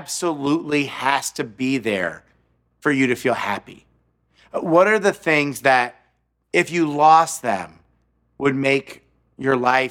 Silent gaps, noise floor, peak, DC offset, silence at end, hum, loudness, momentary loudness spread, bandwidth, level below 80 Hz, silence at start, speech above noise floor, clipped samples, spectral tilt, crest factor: none; -66 dBFS; 0 dBFS; under 0.1%; 0 s; none; -19 LUFS; 12 LU; 17 kHz; -62 dBFS; 0 s; 47 dB; under 0.1%; -4.5 dB/octave; 20 dB